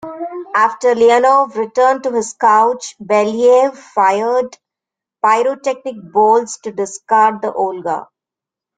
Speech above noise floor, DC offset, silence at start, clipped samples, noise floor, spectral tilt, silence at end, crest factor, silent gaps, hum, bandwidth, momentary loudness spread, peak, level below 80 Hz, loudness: 73 dB; under 0.1%; 0.05 s; under 0.1%; -86 dBFS; -3.5 dB/octave; 0.75 s; 14 dB; none; none; 9.4 kHz; 12 LU; -2 dBFS; -64 dBFS; -14 LUFS